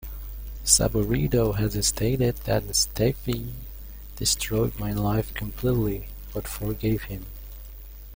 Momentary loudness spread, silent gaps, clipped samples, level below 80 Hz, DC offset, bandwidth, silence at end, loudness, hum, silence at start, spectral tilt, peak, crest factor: 19 LU; none; under 0.1%; -36 dBFS; under 0.1%; 17 kHz; 0 s; -25 LUFS; none; 0 s; -4 dB/octave; -4 dBFS; 24 dB